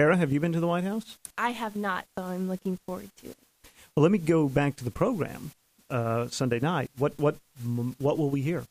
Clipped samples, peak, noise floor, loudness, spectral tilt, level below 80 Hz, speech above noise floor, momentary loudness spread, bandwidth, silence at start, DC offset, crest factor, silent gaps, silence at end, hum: under 0.1%; -8 dBFS; -57 dBFS; -28 LUFS; -7 dB/octave; -58 dBFS; 29 dB; 14 LU; 15.5 kHz; 0 s; under 0.1%; 20 dB; none; 0.05 s; none